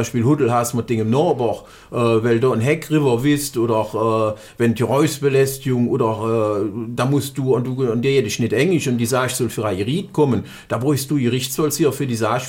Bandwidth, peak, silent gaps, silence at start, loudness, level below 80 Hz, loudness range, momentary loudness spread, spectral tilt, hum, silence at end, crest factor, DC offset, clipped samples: 17 kHz; -4 dBFS; none; 0 s; -19 LUFS; -52 dBFS; 1 LU; 5 LU; -6 dB/octave; none; 0 s; 14 dB; under 0.1%; under 0.1%